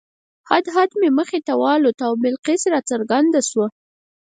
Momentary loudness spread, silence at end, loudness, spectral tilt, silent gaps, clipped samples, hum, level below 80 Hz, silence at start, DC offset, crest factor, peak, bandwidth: 5 LU; 0.55 s; -18 LUFS; -3.5 dB/octave; 1.94-1.98 s, 2.39-2.43 s; under 0.1%; none; -70 dBFS; 0.5 s; under 0.1%; 18 dB; 0 dBFS; 9.6 kHz